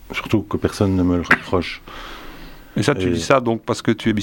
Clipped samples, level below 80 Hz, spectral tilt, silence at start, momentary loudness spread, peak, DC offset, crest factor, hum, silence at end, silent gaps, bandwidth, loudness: under 0.1%; -40 dBFS; -5.5 dB/octave; 0.05 s; 18 LU; 0 dBFS; under 0.1%; 20 dB; none; 0 s; none; 16.5 kHz; -19 LUFS